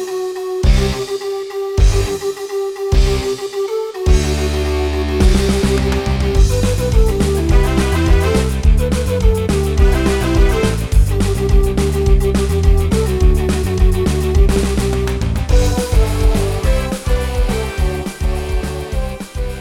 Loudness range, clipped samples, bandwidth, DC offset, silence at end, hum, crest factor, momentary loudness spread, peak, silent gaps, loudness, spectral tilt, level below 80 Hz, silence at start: 3 LU; under 0.1%; 16 kHz; under 0.1%; 0 s; none; 12 dB; 7 LU; -2 dBFS; none; -16 LUFS; -6 dB/octave; -16 dBFS; 0 s